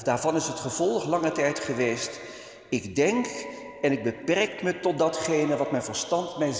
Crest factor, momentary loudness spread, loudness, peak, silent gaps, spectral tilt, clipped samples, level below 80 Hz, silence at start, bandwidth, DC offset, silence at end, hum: 18 dB; 8 LU; -27 LUFS; -10 dBFS; none; -4 dB/octave; under 0.1%; -62 dBFS; 0 s; 8 kHz; under 0.1%; 0 s; none